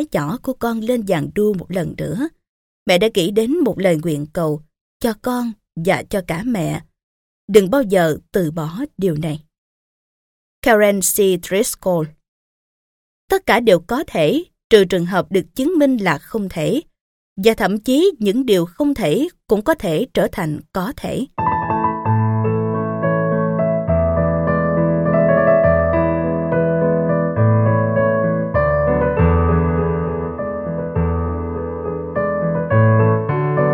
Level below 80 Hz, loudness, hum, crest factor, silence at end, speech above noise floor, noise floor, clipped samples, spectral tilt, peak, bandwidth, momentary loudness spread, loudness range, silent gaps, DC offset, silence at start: -36 dBFS; -18 LUFS; none; 18 dB; 0 s; over 73 dB; under -90 dBFS; under 0.1%; -6 dB/octave; 0 dBFS; 17.5 kHz; 10 LU; 4 LU; 2.49-2.86 s, 4.81-5.00 s, 7.03-7.48 s, 9.58-10.62 s, 12.28-13.28 s, 14.64-14.70 s, 17.01-17.36 s; under 0.1%; 0 s